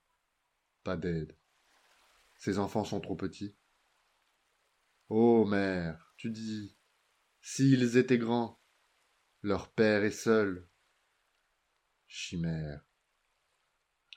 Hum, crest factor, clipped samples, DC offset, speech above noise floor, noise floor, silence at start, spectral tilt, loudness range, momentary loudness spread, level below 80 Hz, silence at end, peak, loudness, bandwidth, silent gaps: none; 20 dB; under 0.1%; under 0.1%; 50 dB; -80 dBFS; 0.85 s; -6 dB/octave; 9 LU; 19 LU; -66 dBFS; 1.35 s; -12 dBFS; -31 LUFS; 15 kHz; none